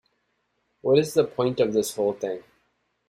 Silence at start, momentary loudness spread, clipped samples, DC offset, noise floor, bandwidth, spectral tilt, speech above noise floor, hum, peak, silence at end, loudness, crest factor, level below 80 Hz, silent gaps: 0.85 s; 11 LU; under 0.1%; under 0.1%; -73 dBFS; 15.5 kHz; -5.5 dB/octave; 50 dB; none; -8 dBFS; 0.65 s; -24 LUFS; 18 dB; -66 dBFS; none